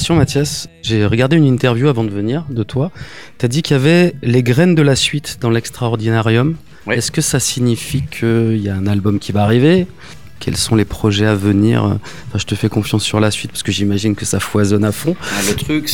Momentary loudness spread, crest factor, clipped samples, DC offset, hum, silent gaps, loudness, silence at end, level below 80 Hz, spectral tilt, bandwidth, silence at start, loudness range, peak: 9 LU; 14 dB; under 0.1%; 1%; none; none; -15 LUFS; 0 s; -40 dBFS; -5.5 dB/octave; 19 kHz; 0 s; 2 LU; 0 dBFS